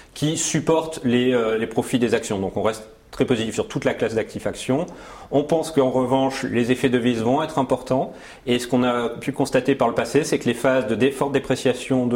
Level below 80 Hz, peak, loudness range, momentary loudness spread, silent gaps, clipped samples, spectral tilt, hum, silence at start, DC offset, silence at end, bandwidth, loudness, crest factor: -52 dBFS; -6 dBFS; 3 LU; 6 LU; none; under 0.1%; -5 dB/octave; none; 0.15 s; under 0.1%; 0 s; 16.5 kHz; -22 LUFS; 16 dB